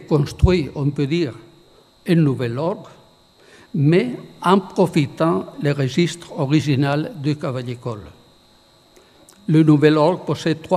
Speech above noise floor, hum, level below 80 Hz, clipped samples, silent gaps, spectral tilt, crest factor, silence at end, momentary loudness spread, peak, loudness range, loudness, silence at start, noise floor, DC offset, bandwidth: 35 dB; none; -38 dBFS; under 0.1%; none; -7.5 dB/octave; 20 dB; 0 s; 12 LU; 0 dBFS; 4 LU; -19 LUFS; 0 s; -53 dBFS; under 0.1%; 13 kHz